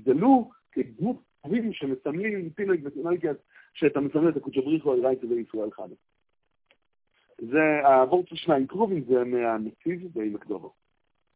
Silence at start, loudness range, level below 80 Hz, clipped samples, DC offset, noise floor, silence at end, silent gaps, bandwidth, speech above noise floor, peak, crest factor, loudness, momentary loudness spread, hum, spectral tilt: 0.05 s; 5 LU; -68 dBFS; under 0.1%; under 0.1%; -76 dBFS; 0.65 s; none; 4 kHz; 51 dB; -8 dBFS; 18 dB; -26 LUFS; 14 LU; none; -10.5 dB/octave